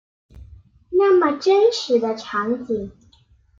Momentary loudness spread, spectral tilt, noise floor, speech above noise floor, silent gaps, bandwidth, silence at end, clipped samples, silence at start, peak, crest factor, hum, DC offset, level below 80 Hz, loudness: 11 LU; -4.5 dB/octave; -56 dBFS; 37 dB; none; 7.6 kHz; 0.7 s; under 0.1%; 0.35 s; -6 dBFS; 16 dB; none; under 0.1%; -52 dBFS; -19 LUFS